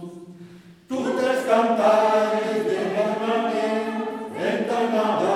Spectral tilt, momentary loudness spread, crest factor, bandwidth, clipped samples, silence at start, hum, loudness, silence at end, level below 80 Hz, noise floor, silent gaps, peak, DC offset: -5 dB/octave; 10 LU; 16 dB; 14.5 kHz; under 0.1%; 0 s; none; -22 LUFS; 0 s; -72 dBFS; -45 dBFS; none; -6 dBFS; under 0.1%